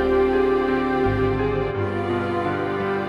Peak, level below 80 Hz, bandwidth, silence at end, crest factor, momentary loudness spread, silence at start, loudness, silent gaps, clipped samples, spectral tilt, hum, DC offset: -8 dBFS; -38 dBFS; 6.2 kHz; 0 s; 14 dB; 5 LU; 0 s; -22 LUFS; none; under 0.1%; -8 dB/octave; none; under 0.1%